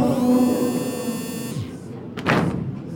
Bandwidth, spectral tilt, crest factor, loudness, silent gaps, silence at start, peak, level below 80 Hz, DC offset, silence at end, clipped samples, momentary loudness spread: 17 kHz; -6 dB/octave; 18 dB; -22 LUFS; none; 0 s; -4 dBFS; -52 dBFS; under 0.1%; 0 s; under 0.1%; 14 LU